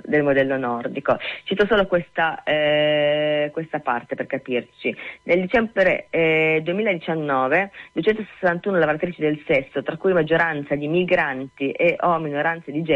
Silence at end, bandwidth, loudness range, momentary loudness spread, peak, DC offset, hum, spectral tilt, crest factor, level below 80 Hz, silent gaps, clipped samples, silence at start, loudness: 0 s; 7.4 kHz; 2 LU; 8 LU; -6 dBFS; under 0.1%; none; -7.5 dB/octave; 14 dB; -54 dBFS; none; under 0.1%; 0.05 s; -21 LUFS